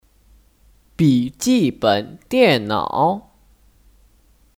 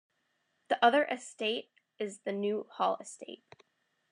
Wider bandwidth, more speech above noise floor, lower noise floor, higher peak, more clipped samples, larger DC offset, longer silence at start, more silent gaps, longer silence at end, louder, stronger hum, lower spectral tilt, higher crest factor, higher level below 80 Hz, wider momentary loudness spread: first, 17 kHz vs 10.5 kHz; second, 38 dB vs 46 dB; second, -55 dBFS vs -78 dBFS; first, -2 dBFS vs -12 dBFS; neither; neither; first, 1 s vs 0.7 s; neither; first, 1.35 s vs 0.75 s; first, -18 LUFS vs -32 LUFS; neither; first, -5.5 dB/octave vs -3.5 dB/octave; about the same, 18 dB vs 22 dB; first, -52 dBFS vs under -90 dBFS; second, 7 LU vs 20 LU